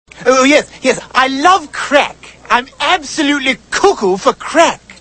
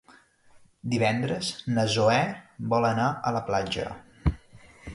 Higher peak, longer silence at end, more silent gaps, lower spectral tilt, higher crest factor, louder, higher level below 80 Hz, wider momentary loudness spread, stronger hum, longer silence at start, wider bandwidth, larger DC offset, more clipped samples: first, 0 dBFS vs -10 dBFS; about the same, 0.1 s vs 0 s; neither; second, -2.5 dB/octave vs -5.5 dB/octave; second, 12 dB vs 18 dB; first, -12 LUFS vs -27 LUFS; about the same, -46 dBFS vs -42 dBFS; second, 5 LU vs 14 LU; neither; second, 0.15 s vs 0.85 s; about the same, 11 kHz vs 11.5 kHz; neither; first, 0.3% vs under 0.1%